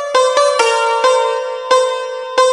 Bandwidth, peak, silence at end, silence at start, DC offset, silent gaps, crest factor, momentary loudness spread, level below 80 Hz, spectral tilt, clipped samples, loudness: 11.5 kHz; 0 dBFS; 0 s; 0 s; under 0.1%; none; 14 dB; 6 LU; -72 dBFS; 1.5 dB/octave; under 0.1%; -14 LUFS